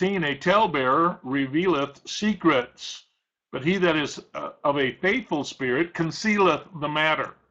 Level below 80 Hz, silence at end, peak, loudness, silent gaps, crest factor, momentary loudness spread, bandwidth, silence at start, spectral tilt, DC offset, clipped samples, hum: -60 dBFS; 0.2 s; -8 dBFS; -24 LUFS; none; 16 dB; 10 LU; 8.2 kHz; 0 s; -5 dB/octave; under 0.1%; under 0.1%; none